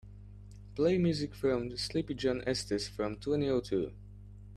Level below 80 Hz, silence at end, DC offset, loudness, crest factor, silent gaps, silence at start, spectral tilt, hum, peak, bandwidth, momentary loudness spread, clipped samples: -52 dBFS; 0 s; under 0.1%; -33 LUFS; 16 dB; none; 0.05 s; -6 dB/octave; 50 Hz at -45 dBFS; -18 dBFS; 13 kHz; 22 LU; under 0.1%